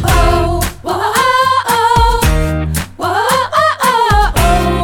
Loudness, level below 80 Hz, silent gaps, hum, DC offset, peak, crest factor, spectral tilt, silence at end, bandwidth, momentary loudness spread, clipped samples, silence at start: -12 LUFS; -18 dBFS; none; none; under 0.1%; 0 dBFS; 12 dB; -4.5 dB/octave; 0 s; over 20 kHz; 7 LU; under 0.1%; 0 s